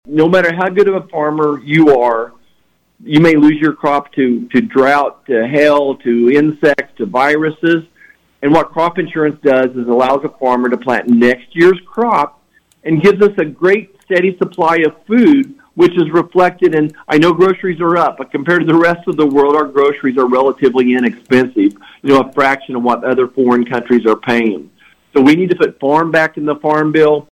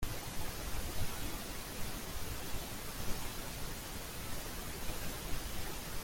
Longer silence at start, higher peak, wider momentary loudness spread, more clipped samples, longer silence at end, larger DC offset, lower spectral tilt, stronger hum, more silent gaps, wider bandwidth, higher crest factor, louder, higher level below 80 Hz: about the same, 0.1 s vs 0 s; first, -2 dBFS vs -22 dBFS; first, 6 LU vs 2 LU; neither; first, 0.15 s vs 0 s; neither; first, -7 dB/octave vs -3 dB/octave; neither; neither; second, 11.5 kHz vs 17 kHz; second, 10 dB vs 16 dB; first, -12 LUFS vs -42 LUFS; second, -52 dBFS vs -46 dBFS